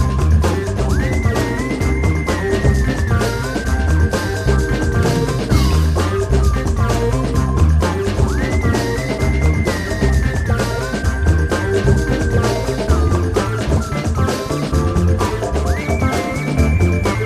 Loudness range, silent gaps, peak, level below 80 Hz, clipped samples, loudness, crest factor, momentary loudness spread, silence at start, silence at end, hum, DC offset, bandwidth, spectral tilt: 1 LU; none; -2 dBFS; -20 dBFS; under 0.1%; -17 LUFS; 14 dB; 4 LU; 0 s; 0 s; none; under 0.1%; 14.5 kHz; -6.5 dB/octave